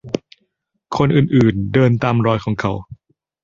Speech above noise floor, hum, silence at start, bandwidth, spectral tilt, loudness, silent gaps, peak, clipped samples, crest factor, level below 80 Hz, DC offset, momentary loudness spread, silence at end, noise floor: 54 dB; none; 0.05 s; 7.4 kHz; -8 dB/octave; -17 LUFS; none; -2 dBFS; under 0.1%; 16 dB; -44 dBFS; under 0.1%; 13 LU; 0.5 s; -69 dBFS